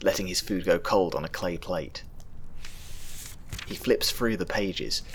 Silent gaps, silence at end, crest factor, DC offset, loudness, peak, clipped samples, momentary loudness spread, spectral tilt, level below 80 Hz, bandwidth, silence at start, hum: none; 0 s; 20 dB; under 0.1%; -28 LUFS; -8 dBFS; under 0.1%; 20 LU; -3.5 dB/octave; -42 dBFS; over 20 kHz; 0 s; none